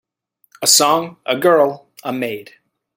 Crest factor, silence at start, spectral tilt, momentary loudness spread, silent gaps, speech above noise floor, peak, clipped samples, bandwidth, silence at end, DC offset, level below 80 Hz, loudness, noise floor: 18 dB; 0.6 s; -2 dB/octave; 15 LU; none; 46 dB; 0 dBFS; under 0.1%; 17 kHz; 0.55 s; under 0.1%; -66 dBFS; -15 LUFS; -62 dBFS